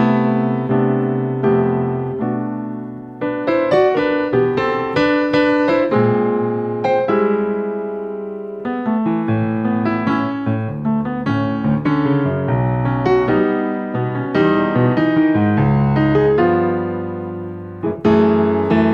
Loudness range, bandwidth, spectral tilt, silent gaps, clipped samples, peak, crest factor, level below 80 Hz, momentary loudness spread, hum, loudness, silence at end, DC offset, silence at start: 4 LU; 6.8 kHz; -9 dB/octave; none; under 0.1%; -2 dBFS; 14 dB; -44 dBFS; 10 LU; none; -17 LUFS; 0 s; under 0.1%; 0 s